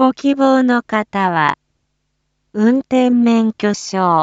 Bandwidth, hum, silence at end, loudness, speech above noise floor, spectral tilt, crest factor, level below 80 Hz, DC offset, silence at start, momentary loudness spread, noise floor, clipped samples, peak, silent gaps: 7.8 kHz; none; 0 s; -15 LUFS; 55 dB; -5.5 dB/octave; 14 dB; -60 dBFS; under 0.1%; 0 s; 6 LU; -69 dBFS; under 0.1%; 0 dBFS; none